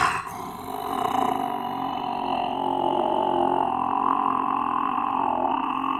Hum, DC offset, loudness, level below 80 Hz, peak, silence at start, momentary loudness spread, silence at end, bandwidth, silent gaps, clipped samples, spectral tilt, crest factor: none; under 0.1%; -25 LUFS; -58 dBFS; -8 dBFS; 0 s; 6 LU; 0 s; 16 kHz; none; under 0.1%; -5 dB/octave; 18 dB